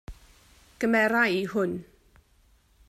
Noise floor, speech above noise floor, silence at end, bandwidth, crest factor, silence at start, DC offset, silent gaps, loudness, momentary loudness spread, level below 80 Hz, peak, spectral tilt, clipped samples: -62 dBFS; 37 dB; 1.05 s; 15.5 kHz; 20 dB; 0.1 s; under 0.1%; none; -25 LUFS; 9 LU; -54 dBFS; -10 dBFS; -5.5 dB/octave; under 0.1%